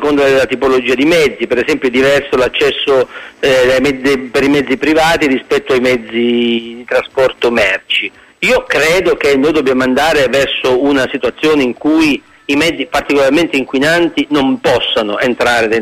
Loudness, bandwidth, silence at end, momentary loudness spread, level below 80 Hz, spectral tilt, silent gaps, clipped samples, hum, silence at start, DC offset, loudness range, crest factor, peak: -12 LUFS; 15.5 kHz; 0 s; 4 LU; -40 dBFS; -4 dB/octave; none; under 0.1%; none; 0 s; under 0.1%; 1 LU; 12 dB; 0 dBFS